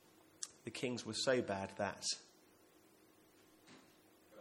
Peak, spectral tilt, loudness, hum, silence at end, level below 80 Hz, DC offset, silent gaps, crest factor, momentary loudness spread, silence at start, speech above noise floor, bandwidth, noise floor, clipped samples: -20 dBFS; -3 dB/octave; -41 LUFS; none; 0 s; -82 dBFS; under 0.1%; none; 24 dB; 26 LU; 0.4 s; 28 dB; 16.5 kHz; -68 dBFS; under 0.1%